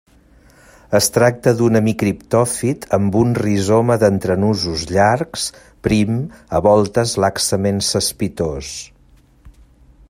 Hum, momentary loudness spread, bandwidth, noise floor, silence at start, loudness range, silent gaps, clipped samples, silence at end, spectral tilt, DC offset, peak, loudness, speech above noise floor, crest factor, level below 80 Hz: none; 9 LU; 16 kHz; -50 dBFS; 0.9 s; 2 LU; none; under 0.1%; 0.6 s; -5 dB/octave; under 0.1%; 0 dBFS; -17 LUFS; 34 dB; 16 dB; -44 dBFS